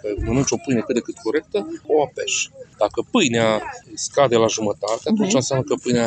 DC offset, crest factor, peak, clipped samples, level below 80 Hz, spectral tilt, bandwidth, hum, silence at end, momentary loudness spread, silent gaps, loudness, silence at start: under 0.1%; 18 dB; -2 dBFS; under 0.1%; -42 dBFS; -4 dB/octave; 9.2 kHz; none; 0 s; 7 LU; none; -21 LUFS; 0.05 s